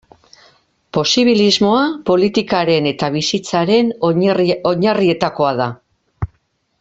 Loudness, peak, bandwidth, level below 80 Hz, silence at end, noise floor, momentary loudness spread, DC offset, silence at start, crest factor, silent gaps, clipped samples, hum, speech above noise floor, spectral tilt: -15 LUFS; 0 dBFS; 8 kHz; -48 dBFS; 0.55 s; -63 dBFS; 10 LU; under 0.1%; 0.95 s; 16 dB; none; under 0.1%; none; 49 dB; -5 dB/octave